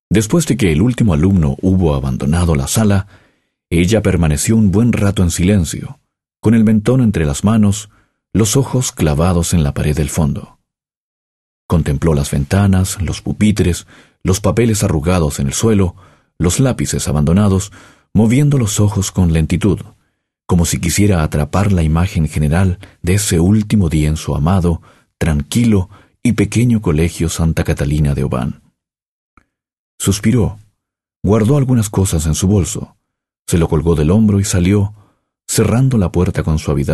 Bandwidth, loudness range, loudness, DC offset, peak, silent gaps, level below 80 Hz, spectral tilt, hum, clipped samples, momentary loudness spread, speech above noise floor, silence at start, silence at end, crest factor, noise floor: 13 kHz; 3 LU; -14 LUFS; under 0.1%; -2 dBFS; 10.97-11.69 s, 29.02-29.37 s, 29.79-29.98 s, 31.16-31.21 s, 33.39-33.45 s; -28 dBFS; -6 dB/octave; none; under 0.1%; 7 LU; 63 dB; 0.1 s; 0 s; 12 dB; -76 dBFS